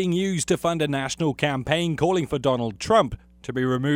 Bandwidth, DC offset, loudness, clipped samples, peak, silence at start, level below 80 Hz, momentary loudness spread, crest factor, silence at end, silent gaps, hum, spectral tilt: 16.5 kHz; under 0.1%; -24 LUFS; under 0.1%; -4 dBFS; 0 s; -48 dBFS; 6 LU; 18 dB; 0 s; none; none; -5 dB/octave